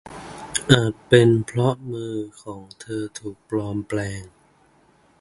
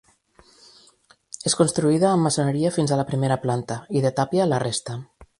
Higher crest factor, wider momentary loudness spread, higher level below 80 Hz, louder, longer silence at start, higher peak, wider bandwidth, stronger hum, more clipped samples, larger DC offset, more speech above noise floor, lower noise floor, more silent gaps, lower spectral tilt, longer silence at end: about the same, 22 dB vs 18 dB; first, 21 LU vs 9 LU; first, -50 dBFS vs -58 dBFS; about the same, -22 LUFS vs -22 LUFS; second, 0.05 s vs 1.45 s; first, 0 dBFS vs -6 dBFS; about the same, 11.5 kHz vs 11.5 kHz; neither; neither; neither; about the same, 36 dB vs 36 dB; about the same, -58 dBFS vs -57 dBFS; neither; about the same, -5.5 dB/octave vs -5.5 dB/octave; first, 0.95 s vs 0.15 s